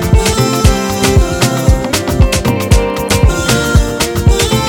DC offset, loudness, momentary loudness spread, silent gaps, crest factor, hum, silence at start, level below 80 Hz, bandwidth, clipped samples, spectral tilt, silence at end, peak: under 0.1%; -12 LUFS; 2 LU; none; 10 dB; none; 0 s; -16 dBFS; 18.5 kHz; 0.4%; -5 dB/octave; 0 s; 0 dBFS